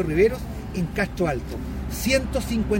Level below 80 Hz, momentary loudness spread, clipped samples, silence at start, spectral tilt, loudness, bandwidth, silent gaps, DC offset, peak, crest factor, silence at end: -34 dBFS; 10 LU; under 0.1%; 0 s; -5.5 dB/octave; -25 LUFS; 16.5 kHz; none; under 0.1%; -8 dBFS; 16 dB; 0 s